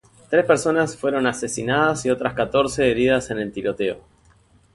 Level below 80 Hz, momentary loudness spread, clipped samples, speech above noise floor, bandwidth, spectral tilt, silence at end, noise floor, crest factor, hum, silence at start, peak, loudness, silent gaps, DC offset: -50 dBFS; 8 LU; under 0.1%; 35 dB; 11.5 kHz; -4.5 dB/octave; 0.75 s; -55 dBFS; 18 dB; none; 0.3 s; -2 dBFS; -21 LUFS; none; under 0.1%